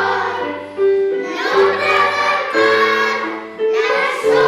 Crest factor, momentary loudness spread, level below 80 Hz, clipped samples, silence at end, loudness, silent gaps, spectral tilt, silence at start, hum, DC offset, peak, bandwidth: 12 dB; 8 LU; -58 dBFS; under 0.1%; 0 s; -16 LUFS; none; -3.5 dB/octave; 0 s; none; under 0.1%; -4 dBFS; 13.5 kHz